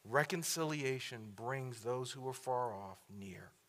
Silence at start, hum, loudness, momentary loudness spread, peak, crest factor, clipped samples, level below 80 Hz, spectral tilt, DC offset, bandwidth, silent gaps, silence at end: 0.05 s; none; -40 LUFS; 15 LU; -16 dBFS; 24 dB; under 0.1%; -82 dBFS; -4 dB/octave; under 0.1%; 16 kHz; none; 0.2 s